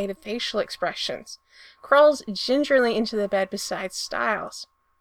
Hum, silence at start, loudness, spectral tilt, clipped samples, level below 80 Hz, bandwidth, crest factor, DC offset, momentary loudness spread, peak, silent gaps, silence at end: none; 0 s; -23 LUFS; -3 dB/octave; under 0.1%; -60 dBFS; 16 kHz; 20 dB; under 0.1%; 18 LU; -4 dBFS; none; 0.35 s